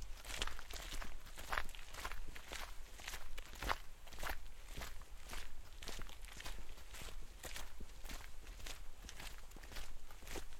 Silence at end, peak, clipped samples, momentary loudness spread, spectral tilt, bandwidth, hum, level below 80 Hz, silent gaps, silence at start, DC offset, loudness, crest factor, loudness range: 0 s; -20 dBFS; under 0.1%; 11 LU; -2.5 dB/octave; 16.5 kHz; none; -50 dBFS; none; 0 s; under 0.1%; -50 LUFS; 24 dB; 5 LU